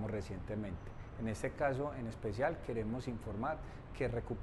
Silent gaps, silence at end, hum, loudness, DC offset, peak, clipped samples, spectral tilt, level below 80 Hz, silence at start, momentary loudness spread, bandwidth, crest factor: none; 0 s; none; -40 LUFS; under 0.1%; -22 dBFS; under 0.1%; -7 dB/octave; -52 dBFS; 0 s; 9 LU; 12 kHz; 18 dB